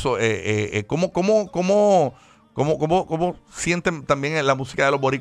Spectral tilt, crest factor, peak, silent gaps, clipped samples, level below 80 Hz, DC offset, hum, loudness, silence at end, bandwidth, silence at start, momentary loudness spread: -5.5 dB/octave; 18 dB; -4 dBFS; none; under 0.1%; -50 dBFS; under 0.1%; none; -21 LUFS; 0 s; 12 kHz; 0 s; 7 LU